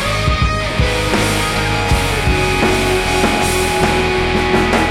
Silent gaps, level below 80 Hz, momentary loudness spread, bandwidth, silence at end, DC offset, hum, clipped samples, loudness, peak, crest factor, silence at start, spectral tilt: none; -24 dBFS; 2 LU; 16.5 kHz; 0 s; under 0.1%; none; under 0.1%; -15 LUFS; 0 dBFS; 14 dB; 0 s; -4.5 dB/octave